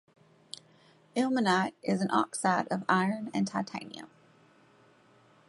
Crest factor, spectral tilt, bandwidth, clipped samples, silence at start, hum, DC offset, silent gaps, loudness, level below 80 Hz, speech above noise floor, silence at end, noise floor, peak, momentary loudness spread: 22 dB; -5 dB/octave; 11.5 kHz; under 0.1%; 1.15 s; none; under 0.1%; none; -30 LUFS; -76 dBFS; 32 dB; 1.45 s; -62 dBFS; -12 dBFS; 19 LU